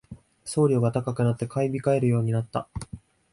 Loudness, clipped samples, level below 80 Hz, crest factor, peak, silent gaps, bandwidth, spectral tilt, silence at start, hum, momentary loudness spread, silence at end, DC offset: -25 LUFS; under 0.1%; -52 dBFS; 16 dB; -10 dBFS; none; 11.5 kHz; -7.5 dB/octave; 0.1 s; none; 17 LU; 0.35 s; under 0.1%